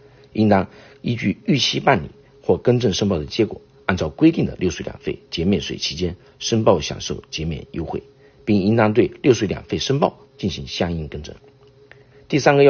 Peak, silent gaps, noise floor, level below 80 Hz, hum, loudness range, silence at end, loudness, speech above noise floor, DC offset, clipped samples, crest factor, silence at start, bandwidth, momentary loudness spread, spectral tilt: 0 dBFS; none; -48 dBFS; -44 dBFS; none; 3 LU; 0 s; -21 LUFS; 29 dB; under 0.1%; under 0.1%; 20 dB; 0.35 s; 6.8 kHz; 12 LU; -5 dB/octave